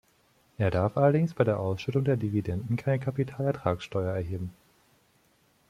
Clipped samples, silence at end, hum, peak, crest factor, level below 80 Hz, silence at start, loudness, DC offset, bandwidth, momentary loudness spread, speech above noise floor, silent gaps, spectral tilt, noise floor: under 0.1%; 1.2 s; none; -10 dBFS; 20 dB; -58 dBFS; 0.6 s; -28 LUFS; under 0.1%; 12.5 kHz; 7 LU; 39 dB; none; -8.5 dB/octave; -66 dBFS